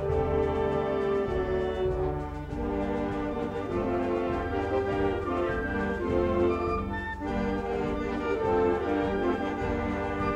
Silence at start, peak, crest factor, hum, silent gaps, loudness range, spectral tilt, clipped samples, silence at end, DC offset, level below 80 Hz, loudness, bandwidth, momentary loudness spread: 0 s; -14 dBFS; 14 dB; none; none; 2 LU; -8 dB/octave; under 0.1%; 0 s; under 0.1%; -40 dBFS; -29 LUFS; 9.6 kHz; 5 LU